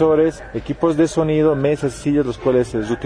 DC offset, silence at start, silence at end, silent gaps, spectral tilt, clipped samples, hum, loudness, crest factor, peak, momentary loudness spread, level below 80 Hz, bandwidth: under 0.1%; 0 s; 0 s; none; -7 dB/octave; under 0.1%; none; -18 LUFS; 14 dB; -4 dBFS; 5 LU; -40 dBFS; 10.5 kHz